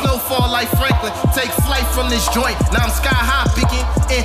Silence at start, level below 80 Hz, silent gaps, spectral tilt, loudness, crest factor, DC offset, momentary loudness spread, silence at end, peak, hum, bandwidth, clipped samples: 0 s; -20 dBFS; none; -4.5 dB/octave; -16 LUFS; 12 dB; under 0.1%; 2 LU; 0 s; -4 dBFS; none; 15.5 kHz; under 0.1%